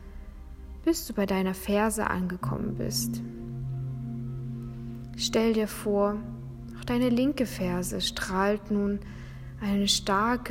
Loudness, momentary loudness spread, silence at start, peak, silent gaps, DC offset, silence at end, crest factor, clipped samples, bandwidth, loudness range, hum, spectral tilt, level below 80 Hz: -29 LUFS; 15 LU; 0 s; -8 dBFS; none; under 0.1%; 0 s; 20 dB; under 0.1%; 16 kHz; 3 LU; none; -4.5 dB/octave; -46 dBFS